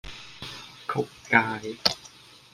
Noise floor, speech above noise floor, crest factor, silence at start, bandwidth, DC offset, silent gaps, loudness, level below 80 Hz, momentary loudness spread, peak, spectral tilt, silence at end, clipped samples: -51 dBFS; 24 dB; 28 dB; 0.05 s; 16 kHz; under 0.1%; none; -26 LUFS; -56 dBFS; 17 LU; 0 dBFS; -3.5 dB/octave; 0.45 s; under 0.1%